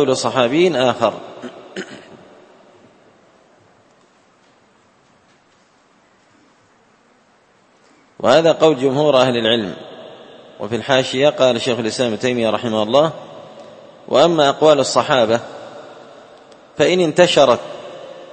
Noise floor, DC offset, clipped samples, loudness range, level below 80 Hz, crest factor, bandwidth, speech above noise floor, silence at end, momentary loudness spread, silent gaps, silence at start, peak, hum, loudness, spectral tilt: -54 dBFS; under 0.1%; under 0.1%; 6 LU; -60 dBFS; 18 dB; 8.8 kHz; 40 dB; 0.05 s; 22 LU; none; 0 s; 0 dBFS; none; -15 LUFS; -4.5 dB/octave